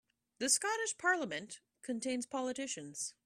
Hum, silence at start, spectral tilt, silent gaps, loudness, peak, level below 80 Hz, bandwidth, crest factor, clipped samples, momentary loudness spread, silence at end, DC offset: none; 0.4 s; -1 dB/octave; none; -36 LUFS; -16 dBFS; -82 dBFS; 15 kHz; 22 dB; under 0.1%; 12 LU; 0.15 s; under 0.1%